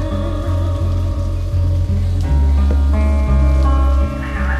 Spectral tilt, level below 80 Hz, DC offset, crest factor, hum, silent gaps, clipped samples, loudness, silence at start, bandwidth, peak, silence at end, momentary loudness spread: -8 dB/octave; -16 dBFS; under 0.1%; 10 dB; none; none; under 0.1%; -17 LUFS; 0 s; 7.4 kHz; -4 dBFS; 0 s; 6 LU